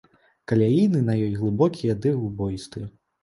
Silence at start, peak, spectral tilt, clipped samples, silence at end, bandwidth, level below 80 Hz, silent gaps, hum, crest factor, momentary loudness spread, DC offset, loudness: 0.5 s; -6 dBFS; -8.5 dB/octave; under 0.1%; 0.35 s; 11.5 kHz; -50 dBFS; none; none; 16 dB; 15 LU; under 0.1%; -23 LUFS